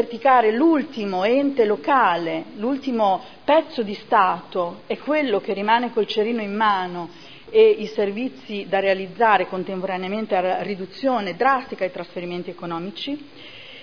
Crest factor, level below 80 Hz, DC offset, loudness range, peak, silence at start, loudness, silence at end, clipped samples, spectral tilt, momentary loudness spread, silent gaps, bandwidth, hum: 18 dB; -66 dBFS; 0.4%; 4 LU; -2 dBFS; 0 s; -21 LUFS; 0 s; under 0.1%; -6.5 dB/octave; 13 LU; none; 5.4 kHz; none